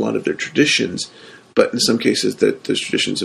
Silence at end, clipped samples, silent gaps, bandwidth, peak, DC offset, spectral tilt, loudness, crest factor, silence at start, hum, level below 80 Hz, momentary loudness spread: 0 s; under 0.1%; none; 13 kHz; 0 dBFS; under 0.1%; -3.5 dB/octave; -18 LUFS; 18 dB; 0 s; none; -60 dBFS; 7 LU